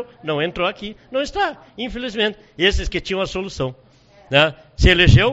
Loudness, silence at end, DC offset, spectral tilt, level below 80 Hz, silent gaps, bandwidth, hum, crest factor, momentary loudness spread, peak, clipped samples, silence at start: -19 LUFS; 0 s; under 0.1%; -3.5 dB/octave; -28 dBFS; none; 8 kHz; none; 20 dB; 13 LU; 0 dBFS; under 0.1%; 0 s